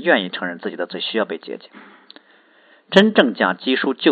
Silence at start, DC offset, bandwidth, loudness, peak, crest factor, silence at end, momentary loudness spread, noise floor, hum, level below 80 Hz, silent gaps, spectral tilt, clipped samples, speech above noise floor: 0 s; under 0.1%; 8.4 kHz; -18 LUFS; 0 dBFS; 20 dB; 0 s; 14 LU; -53 dBFS; none; -66 dBFS; none; -6 dB/octave; under 0.1%; 35 dB